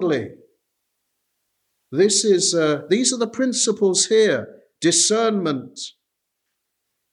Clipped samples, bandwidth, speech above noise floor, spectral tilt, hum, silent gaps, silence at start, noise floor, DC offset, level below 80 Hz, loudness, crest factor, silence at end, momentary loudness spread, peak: under 0.1%; 12 kHz; 59 dB; -3 dB/octave; none; none; 0 s; -78 dBFS; under 0.1%; -74 dBFS; -18 LUFS; 16 dB; 1.25 s; 13 LU; -6 dBFS